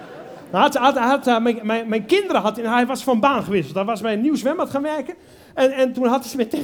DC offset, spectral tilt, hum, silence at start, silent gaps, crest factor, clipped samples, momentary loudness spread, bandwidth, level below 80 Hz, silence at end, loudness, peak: under 0.1%; -5 dB/octave; none; 0 s; none; 18 dB; under 0.1%; 8 LU; 19.5 kHz; -60 dBFS; 0 s; -20 LUFS; -2 dBFS